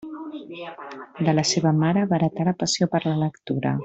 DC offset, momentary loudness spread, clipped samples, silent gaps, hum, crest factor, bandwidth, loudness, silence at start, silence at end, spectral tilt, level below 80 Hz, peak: under 0.1%; 16 LU; under 0.1%; none; none; 16 dB; 8.2 kHz; -22 LUFS; 0 s; 0 s; -5.5 dB/octave; -60 dBFS; -8 dBFS